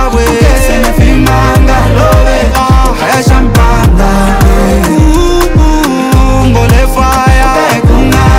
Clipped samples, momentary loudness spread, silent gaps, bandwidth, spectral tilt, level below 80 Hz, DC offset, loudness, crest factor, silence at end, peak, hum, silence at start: 9%; 2 LU; none; 16.5 kHz; -6 dB/octave; -8 dBFS; under 0.1%; -7 LUFS; 6 dB; 0 s; 0 dBFS; none; 0 s